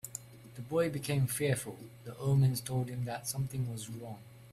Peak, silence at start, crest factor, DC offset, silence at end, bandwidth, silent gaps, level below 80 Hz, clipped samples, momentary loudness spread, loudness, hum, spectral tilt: -18 dBFS; 0.05 s; 16 dB; under 0.1%; 0 s; 15 kHz; none; -62 dBFS; under 0.1%; 19 LU; -34 LUFS; none; -5.5 dB/octave